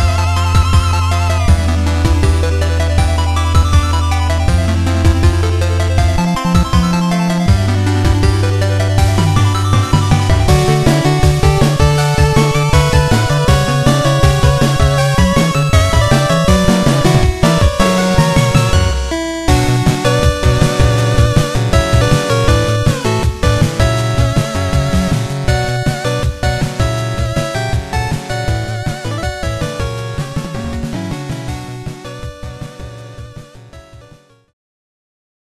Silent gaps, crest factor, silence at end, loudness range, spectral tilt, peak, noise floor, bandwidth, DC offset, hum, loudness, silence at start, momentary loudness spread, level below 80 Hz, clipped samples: none; 12 dB; 1.6 s; 10 LU; -5.5 dB/octave; 0 dBFS; -43 dBFS; 14 kHz; under 0.1%; none; -13 LUFS; 0 s; 10 LU; -20 dBFS; under 0.1%